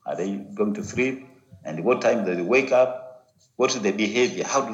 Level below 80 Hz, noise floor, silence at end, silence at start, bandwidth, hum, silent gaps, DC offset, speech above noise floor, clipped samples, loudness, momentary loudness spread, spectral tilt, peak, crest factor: -70 dBFS; -50 dBFS; 0 s; 0.05 s; 8 kHz; none; none; under 0.1%; 28 dB; under 0.1%; -23 LUFS; 10 LU; -4 dB/octave; -8 dBFS; 16 dB